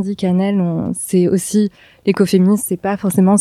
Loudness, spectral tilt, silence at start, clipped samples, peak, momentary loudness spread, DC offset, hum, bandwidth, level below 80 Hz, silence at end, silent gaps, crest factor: -16 LUFS; -6.5 dB/octave; 0 s; under 0.1%; 0 dBFS; 7 LU; under 0.1%; none; 14 kHz; -52 dBFS; 0 s; none; 14 dB